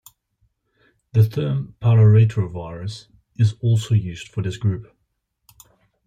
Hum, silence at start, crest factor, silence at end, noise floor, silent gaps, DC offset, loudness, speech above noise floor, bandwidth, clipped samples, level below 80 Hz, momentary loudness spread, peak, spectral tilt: none; 1.15 s; 16 dB; 1.25 s; -72 dBFS; none; under 0.1%; -20 LUFS; 54 dB; 8.8 kHz; under 0.1%; -54 dBFS; 17 LU; -4 dBFS; -8 dB/octave